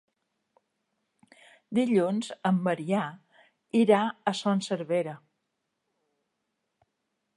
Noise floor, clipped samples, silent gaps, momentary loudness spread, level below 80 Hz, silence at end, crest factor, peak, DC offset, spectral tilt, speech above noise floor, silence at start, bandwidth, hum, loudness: -81 dBFS; under 0.1%; none; 8 LU; -80 dBFS; 2.2 s; 22 dB; -8 dBFS; under 0.1%; -6 dB/octave; 55 dB; 1.7 s; 11.5 kHz; none; -27 LUFS